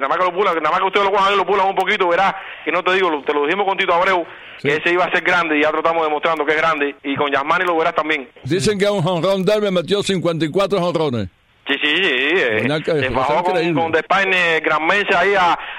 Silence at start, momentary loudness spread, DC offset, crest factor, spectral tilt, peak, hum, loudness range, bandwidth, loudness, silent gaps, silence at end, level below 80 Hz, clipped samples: 0 s; 6 LU; under 0.1%; 14 dB; -5 dB/octave; -2 dBFS; none; 2 LU; 15 kHz; -17 LUFS; none; 0 s; -50 dBFS; under 0.1%